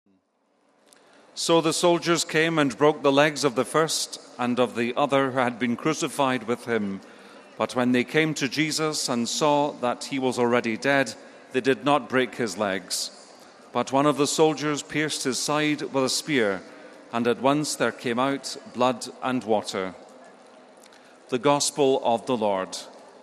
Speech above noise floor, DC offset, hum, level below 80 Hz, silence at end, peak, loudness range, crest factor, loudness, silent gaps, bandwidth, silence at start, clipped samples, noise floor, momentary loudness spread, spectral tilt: 44 dB; under 0.1%; none; -72 dBFS; 0.15 s; -4 dBFS; 4 LU; 20 dB; -24 LUFS; none; 14.5 kHz; 1.35 s; under 0.1%; -68 dBFS; 9 LU; -3.5 dB/octave